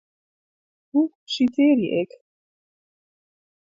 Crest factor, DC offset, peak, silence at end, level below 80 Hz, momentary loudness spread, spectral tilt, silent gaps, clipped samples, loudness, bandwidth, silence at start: 16 dB; under 0.1%; -8 dBFS; 1.6 s; -70 dBFS; 8 LU; -6 dB/octave; 1.15-1.27 s; under 0.1%; -22 LUFS; 7.6 kHz; 0.95 s